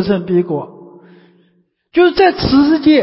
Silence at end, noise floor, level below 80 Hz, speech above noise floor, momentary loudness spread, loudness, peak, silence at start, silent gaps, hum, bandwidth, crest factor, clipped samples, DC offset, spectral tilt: 0 s; -58 dBFS; -40 dBFS; 47 dB; 11 LU; -13 LUFS; 0 dBFS; 0 s; none; none; 5.8 kHz; 14 dB; under 0.1%; under 0.1%; -10 dB/octave